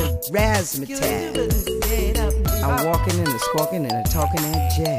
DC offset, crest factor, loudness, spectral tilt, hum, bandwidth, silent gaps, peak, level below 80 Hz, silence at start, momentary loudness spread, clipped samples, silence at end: under 0.1%; 14 dB; -21 LUFS; -5 dB/octave; none; 15.5 kHz; none; -6 dBFS; -26 dBFS; 0 s; 3 LU; under 0.1%; 0 s